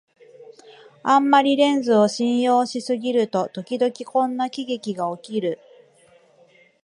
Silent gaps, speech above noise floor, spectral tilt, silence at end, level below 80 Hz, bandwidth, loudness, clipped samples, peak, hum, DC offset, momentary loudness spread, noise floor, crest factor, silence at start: none; 35 dB; -5 dB/octave; 1.3 s; -76 dBFS; 11.5 kHz; -21 LUFS; under 0.1%; -2 dBFS; none; under 0.1%; 11 LU; -55 dBFS; 20 dB; 0.4 s